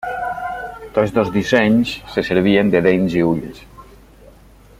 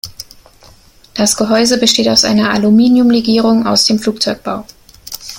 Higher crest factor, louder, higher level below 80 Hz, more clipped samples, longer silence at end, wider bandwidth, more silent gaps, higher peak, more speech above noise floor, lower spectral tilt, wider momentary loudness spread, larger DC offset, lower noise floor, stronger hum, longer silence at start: first, 18 dB vs 12 dB; second, -17 LUFS vs -11 LUFS; about the same, -44 dBFS vs -46 dBFS; neither; first, 0.95 s vs 0 s; about the same, 15.5 kHz vs 17 kHz; neither; about the same, 0 dBFS vs 0 dBFS; about the same, 29 dB vs 32 dB; first, -6.5 dB/octave vs -3.5 dB/octave; second, 11 LU vs 17 LU; neither; about the same, -45 dBFS vs -43 dBFS; neither; about the same, 0 s vs 0.05 s